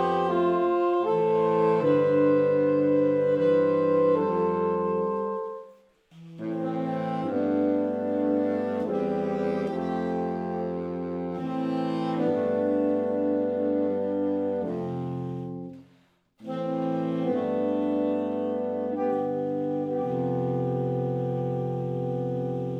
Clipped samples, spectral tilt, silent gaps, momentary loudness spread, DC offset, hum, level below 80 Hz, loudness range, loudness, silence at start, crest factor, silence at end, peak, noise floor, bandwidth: under 0.1%; -9.5 dB/octave; none; 9 LU; under 0.1%; none; -68 dBFS; 7 LU; -26 LUFS; 0 s; 14 dB; 0 s; -12 dBFS; -63 dBFS; 6 kHz